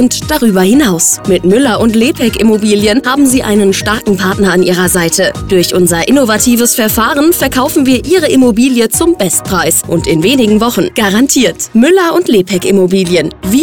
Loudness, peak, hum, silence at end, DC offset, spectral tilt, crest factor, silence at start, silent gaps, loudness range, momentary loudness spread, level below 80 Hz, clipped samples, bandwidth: -9 LUFS; 0 dBFS; none; 0 s; 0.6%; -4 dB/octave; 8 dB; 0 s; none; 1 LU; 3 LU; -32 dBFS; under 0.1%; 19.5 kHz